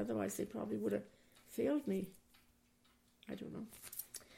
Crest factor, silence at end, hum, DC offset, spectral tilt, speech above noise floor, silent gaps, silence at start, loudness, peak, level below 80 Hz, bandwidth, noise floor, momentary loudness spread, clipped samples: 18 dB; 0 s; none; under 0.1%; -5.5 dB/octave; 32 dB; none; 0 s; -42 LUFS; -26 dBFS; -74 dBFS; 16.5 kHz; -73 dBFS; 14 LU; under 0.1%